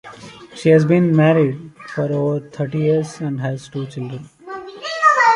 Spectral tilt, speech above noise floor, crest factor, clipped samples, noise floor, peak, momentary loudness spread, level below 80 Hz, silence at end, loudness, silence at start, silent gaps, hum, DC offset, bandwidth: -7 dB/octave; 21 dB; 16 dB; under 0.1%; -38 dBFS; -2 dBFS; 20 LU; -60 dBFS; 0 s; -18 LUFS; 0.05 s; none; none; under 0.1%; 11 kHz